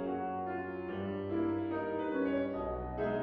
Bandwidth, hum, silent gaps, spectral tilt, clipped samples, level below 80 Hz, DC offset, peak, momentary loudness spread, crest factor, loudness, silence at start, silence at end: 4.9 kHz; none; none; -6.5 dB/octave; under 0.1%; -54 dBFS; under 0.1%; -22 dBFS; 5 LU; 14 dB; -36 LUFS; 0 s; 0 s